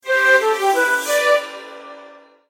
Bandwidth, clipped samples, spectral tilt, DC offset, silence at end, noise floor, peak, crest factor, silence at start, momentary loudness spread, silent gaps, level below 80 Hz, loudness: 16 kHz; under 0.1%; 1 dB/octave; under 0.1%; 0.45 s; -44 dBFS; -4 dBFS; 16 dB; 0.05 s; 21 LU; none; -78 dBFS; -16 LUFS